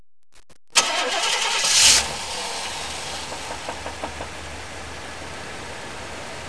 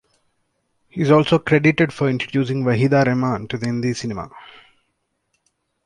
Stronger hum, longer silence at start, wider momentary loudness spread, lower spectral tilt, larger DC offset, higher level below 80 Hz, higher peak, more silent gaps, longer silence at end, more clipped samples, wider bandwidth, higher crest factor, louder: neither; second, 0.35 s vs 0.95 s; first, 20 LU vs 12 LU; second, 0.5 dB/octave vs -7 dB/octave; first, 0.8% vs under 0.1%; about the same, -48 dBFS vs -52 dBFS; about the same, 0 dBFS vs -2 dBFS; neither; second, 0 s vs 1.4 s; neither; about the same, 11 kHz vs 10.5 kHz; first, 24 dB vs 18 dB; about the same, -20 LUFS vs -19 LUFS